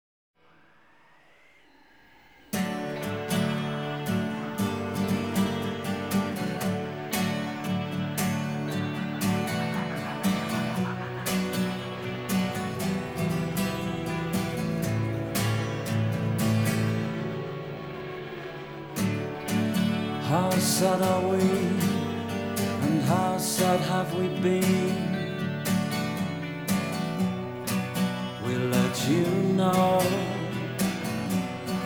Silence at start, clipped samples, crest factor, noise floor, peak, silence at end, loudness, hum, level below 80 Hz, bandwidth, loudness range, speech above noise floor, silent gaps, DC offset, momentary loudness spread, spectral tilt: 2.5 s; under 0.1%; 18 dB; -60 dBFS; -10 dBFS; 0 s; -28 LUFS; none; -58 dBFS; over 20 kHz; 5 LU; 36 dB; none; under 0.1%; 8 LU; -5.5 dB/octave